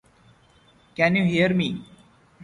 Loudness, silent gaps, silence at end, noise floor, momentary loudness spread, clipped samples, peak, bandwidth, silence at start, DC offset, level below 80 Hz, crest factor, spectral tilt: -22 LUFS; none; 0 s; -57 dBFS; 16 LU; under 0.1%; -6 dBFS; 10.5 kHz; 1 s; under 0.1%; -58 dBFS; 20 dB; -7 dB/octave